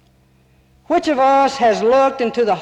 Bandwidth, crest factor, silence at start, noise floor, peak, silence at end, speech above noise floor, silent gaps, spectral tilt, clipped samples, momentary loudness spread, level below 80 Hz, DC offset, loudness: 10 kHz; 10 dB; 0.9 s; -54 dBFS; -6 dBFS; 0 s; 39 dB; none; -4.5 dB/octave; under 0.1%; 5 LU; -54 dBFS; under 0.1%; -15 LUFS